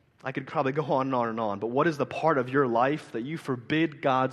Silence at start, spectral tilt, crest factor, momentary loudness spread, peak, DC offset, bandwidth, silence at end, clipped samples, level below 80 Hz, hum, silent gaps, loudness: 0.25 s; -7 dB/octave; 18 dB; 9 LU; -10 dBFS; under 0.1%; 12.5 kHz; 0 s; under 0.1%; -70 dBFS; none; none; -27 LUFS